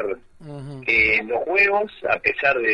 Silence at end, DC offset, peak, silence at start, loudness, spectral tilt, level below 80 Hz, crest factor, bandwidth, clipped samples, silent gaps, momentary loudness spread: 0 s; under 0.1%; -2 dBFS; 0 s; -19 LUFS; -6 dB/octave; -48 dBFS; 20 dB; 10 kHz; under 0.1%; none; 19 LU